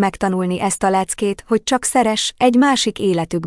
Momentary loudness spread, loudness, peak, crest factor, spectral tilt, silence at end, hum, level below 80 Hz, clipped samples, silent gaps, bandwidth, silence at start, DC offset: 6 LU; -17 LUFS; -2 dBFS; 14 dB; -4 dB/octave; 0 s; none; -48 dBFS; under 0.1%; none; 12 kHz; 0 s; under 0.1%